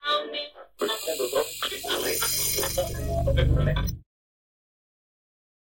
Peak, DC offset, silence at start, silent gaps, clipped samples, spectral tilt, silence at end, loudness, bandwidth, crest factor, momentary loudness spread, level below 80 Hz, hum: -10 dBFS; under 0.1%; 0 s; none; under 0.1%; -3.5 dB/octave; 1.7 s; -26 LUFS; 17 kHz; 18 dB; 10 LU; -36 dBFS; none